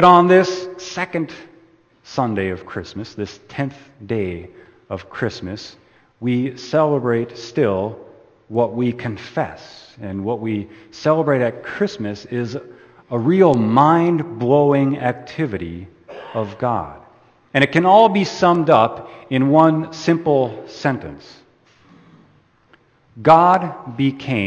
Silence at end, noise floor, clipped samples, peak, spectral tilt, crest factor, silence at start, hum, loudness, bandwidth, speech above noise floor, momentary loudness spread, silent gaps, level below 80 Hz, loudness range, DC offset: 0 s; -55 dBFS; under 0.1%; 0 dBFS; -7 dB/octave; 18 dB; 0 s; none; -18 LUFS; 8.6 kHz; 37 dB; 17 LU; none; -56 dBFS; 11 LU; under 0.1%